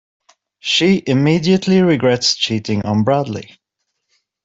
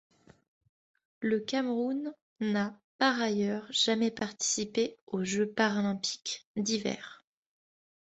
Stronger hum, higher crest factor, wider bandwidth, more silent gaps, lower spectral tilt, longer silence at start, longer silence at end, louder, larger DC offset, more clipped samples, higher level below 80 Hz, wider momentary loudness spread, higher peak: neither; second, 14 dB vs 20 dB; about the same, 7.8 kHz vs 8.4 kHz; second, none vs 2.22-2.36 s, 2.84-2.99 s, 5.01-5.07 s, 6.45-6.55 s; first, -5 dB/octave vs -3.5 dB/octave; second, 0.65 s vs 1.2 s; about the same, 1 s vs 0.95 s; first, -15 LUFS vs -31 LUFS; neither; neither; first, -52 dBFS vs -74 dBFS; second, 6 LU vs 9 LU; first, -2 dBFS vs -12 dBFS